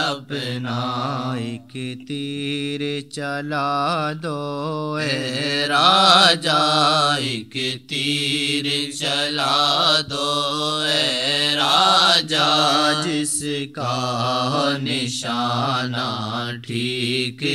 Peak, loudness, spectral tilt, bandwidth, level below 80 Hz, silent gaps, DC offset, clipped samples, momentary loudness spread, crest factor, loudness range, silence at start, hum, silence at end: -2 dBFS; -19 LUFS; -3.5 dB/octave; 14 kHz; -66 dBFS; none; 0.1%; under 0.1%; 12 LU; 20 dB; 8 LU; 0 s; none; 0 s